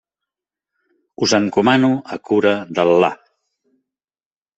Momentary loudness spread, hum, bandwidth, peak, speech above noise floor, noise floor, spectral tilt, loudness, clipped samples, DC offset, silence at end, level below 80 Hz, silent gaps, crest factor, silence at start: 7 LU; none; 8.2 kHz; 0 dBFS; over 74 dB; under -90 dBFS; -5 dB/octave; -16 LUFS; under 0.1%; under 0.1%; 1.45 s; -62 dBFS; none; 18 dB; 1.2 s